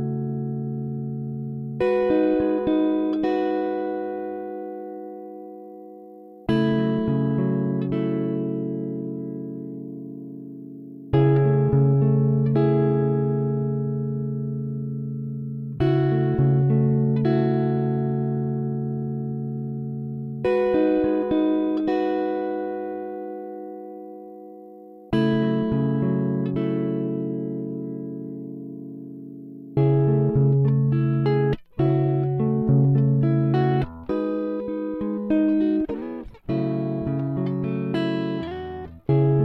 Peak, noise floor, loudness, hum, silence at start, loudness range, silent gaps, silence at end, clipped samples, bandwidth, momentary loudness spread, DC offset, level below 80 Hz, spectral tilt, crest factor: -8 dBFS; -44 dBFS; -23 LUFS; none; 0 s; 7 LU; none; 0 s; under 0.1%; 4.6 kHz; 17 LU; under 0.1%; -50 dBFS; -11 dB/octave; 16 dB